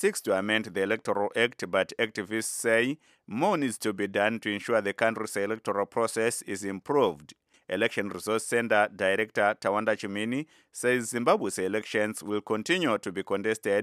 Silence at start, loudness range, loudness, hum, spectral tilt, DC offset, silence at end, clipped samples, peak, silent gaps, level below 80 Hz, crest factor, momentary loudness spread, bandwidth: 0 s; 2 LU; -28 LUFS; none; -3.5 dB/octave; under 0.1%; 0 s; under 0.1%; -8 dBFS; none; -76 dBFS; 20 dB; 6 LU; 15.5 kHz